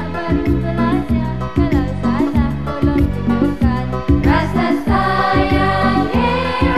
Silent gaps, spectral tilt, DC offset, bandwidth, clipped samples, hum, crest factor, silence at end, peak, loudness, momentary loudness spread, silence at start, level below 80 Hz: none; -8 dB/octave; 3%; 13.5 kHz; under 0.1%; none; 14 dB; 0 s; -2 dBFS; -16 LUFS; 4 LU; 0 s; -24 dBFS